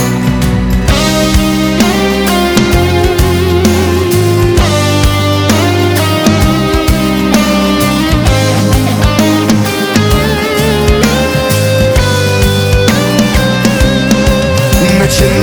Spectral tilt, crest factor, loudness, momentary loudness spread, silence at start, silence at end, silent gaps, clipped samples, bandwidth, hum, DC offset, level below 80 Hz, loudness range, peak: -5 dB/octave; 8 dB; -9 LUFS; 2 LU; 0 s; 0 s; none; under 0.1%; over 20 kHz; none; under 0.1%; -18 dBFS; 0 LU; 0 dBFS